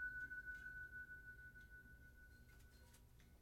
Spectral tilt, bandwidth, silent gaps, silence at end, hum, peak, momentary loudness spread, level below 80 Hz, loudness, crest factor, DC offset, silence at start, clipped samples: -4 dB/octave; 18 kHz; none; 0 s; 60 Hz at -70 dBFS; -40 dBFS; 16 LU; -68 dBFS; -55 LUFS; 16 dB; under 0.1%; 0 s; under 0.1%